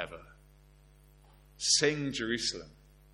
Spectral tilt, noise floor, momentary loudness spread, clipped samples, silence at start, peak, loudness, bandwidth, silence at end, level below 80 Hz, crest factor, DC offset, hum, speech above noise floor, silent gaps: -2 dB/octave; -59 dBFS; 19 LU; under 0.1%; 0 s; -12 dBFS; -30 LUFS; 16.5 kHz; 0.4 s; -60 dBFS; 24 dB; under 0.1%; none; 28 dB; none